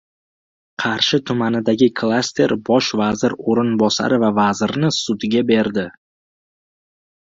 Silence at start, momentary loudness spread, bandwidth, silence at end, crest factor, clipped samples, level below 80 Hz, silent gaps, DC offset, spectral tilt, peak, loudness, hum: 0.8 s; 5 LU; 7.8 kHz; 1.3 s; 16 dB; under 0.1%; -56 dBFS; none; under 0.1%; -5 dB/octave; -2 dBFS; -18 LUFS; none